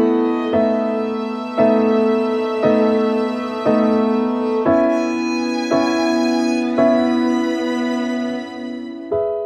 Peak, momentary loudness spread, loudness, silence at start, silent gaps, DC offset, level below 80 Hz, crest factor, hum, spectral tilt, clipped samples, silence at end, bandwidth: -4 dBFS; 8 LU; -18 LUFS; 0 s; none; under 0.1%; -58 dBFS; 14 dB; none; -5.5 dB/octave; under 0.1%; 0 s; 9.6 kHz